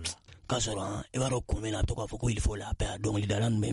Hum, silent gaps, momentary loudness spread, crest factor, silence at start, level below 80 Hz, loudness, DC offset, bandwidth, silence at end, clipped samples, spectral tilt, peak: none; none; 6 LU; 16 dB; 0 s; -38 dBFS; -32 LUFS; under 0.1%; 11.5 kHz; 0 s; under 0.1%; -5 dB/octave; -16 dBFS